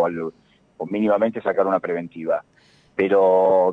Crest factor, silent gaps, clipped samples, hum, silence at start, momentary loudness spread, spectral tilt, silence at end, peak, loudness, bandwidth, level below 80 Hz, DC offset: 14 dB; none; under 0.1%; none; 0 s; 15 LU; -8.5 dB/octave; 0 s; -6 dBFS; -21 LUFS; 4.8 kHz; -66 dBFS; under 0.1%